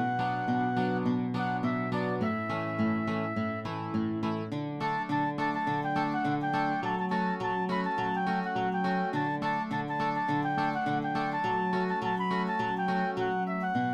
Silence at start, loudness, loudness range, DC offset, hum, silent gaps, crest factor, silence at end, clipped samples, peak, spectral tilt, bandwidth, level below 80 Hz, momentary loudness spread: 0 s; -30 LUFS; 2 LU; under 0.1%; none; none; 12 dB; 0 s; under 0.1%; -18 dBFS; -7.5 dB/octave; 9.4 kHz; -64 dBFS; 3 LU